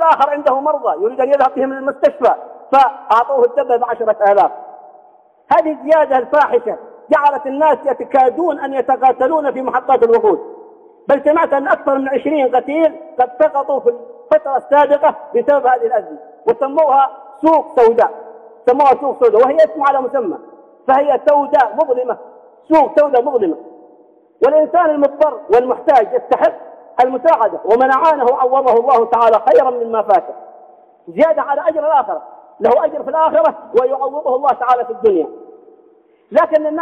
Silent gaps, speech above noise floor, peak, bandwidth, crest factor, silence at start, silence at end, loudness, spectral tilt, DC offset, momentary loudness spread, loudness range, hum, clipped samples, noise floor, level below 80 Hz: none; 37 dB; -2 dBFS; 7.2 kHz; 12 dB; 0 s; 0 s; -14 LUFS; -6 dB/octave; under 0.1%; 7 LU; 3 LU; none; under 0.1%; -50 dBFS; -60 dBFS